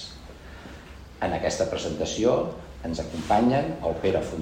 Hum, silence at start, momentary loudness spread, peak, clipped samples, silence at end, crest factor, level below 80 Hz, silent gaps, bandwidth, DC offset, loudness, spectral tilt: none; 0 s; 21 LU; -10 dBFS; under 0.1%; 0 s; 18 dB; -44 dBFS; none; 16 kHz; under 0.1%; -26 LUFS; -5.5 dB/octave